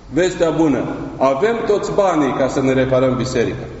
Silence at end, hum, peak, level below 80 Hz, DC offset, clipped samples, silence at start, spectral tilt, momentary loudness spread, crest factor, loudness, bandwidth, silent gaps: 0 s; none; -2 dBFS; -40 dBFS; under 0.1%; under 0.1%; 0 s; -5.5 dB/octave; 4 LU; 16 dB; -17 LUFS; 8 kHz; none